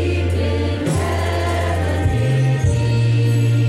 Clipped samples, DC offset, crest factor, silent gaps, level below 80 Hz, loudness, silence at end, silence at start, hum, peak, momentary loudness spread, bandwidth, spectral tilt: under 0.1%; under 0.1%; 10 dB; none; -30 dBFS; -18 LUFS; 0 s; 0 s; none; -6 dBFS; 4 LU; 13 kHz; -6.5 dB/octave